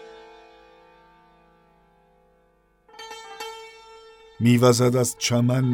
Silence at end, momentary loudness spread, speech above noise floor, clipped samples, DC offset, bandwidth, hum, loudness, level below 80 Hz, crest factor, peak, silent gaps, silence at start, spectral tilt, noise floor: 0 s; 25 LU; 44 dB; under 0.1%; under 0.1%; 16.5 kHz; 50 Hz at -70 dBFS; -20 LUFS; -64 dBFS; 20 dB; -4 dBFS; none; 0 s; -5.5 dB/octave; -62 dBFS